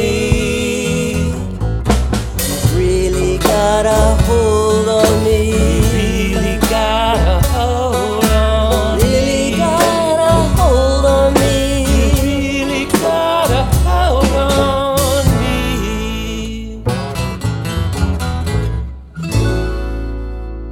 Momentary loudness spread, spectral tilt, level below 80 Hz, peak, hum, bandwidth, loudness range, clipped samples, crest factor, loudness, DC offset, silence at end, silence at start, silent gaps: 8 LU; -5.5 dB/octave; -20 dBFS; 0 dBFS; none; 18 kHz; 6 LU; under 0.1%; 12 dB; -14 LUFS; under 0.1%; 0 s; 0 s; none